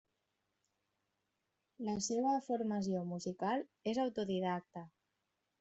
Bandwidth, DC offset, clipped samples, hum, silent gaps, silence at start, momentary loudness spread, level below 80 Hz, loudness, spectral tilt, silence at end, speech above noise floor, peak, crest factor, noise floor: 8 kHz; under 0.1%; under 0.1%; none; none; 1.8 s; 8 LU; -76 dBFS; -38 LUFS; -5.5 dB/octave; 0.75 s; 48 dB; -24 dBFS; 16 dB; -86 dBFS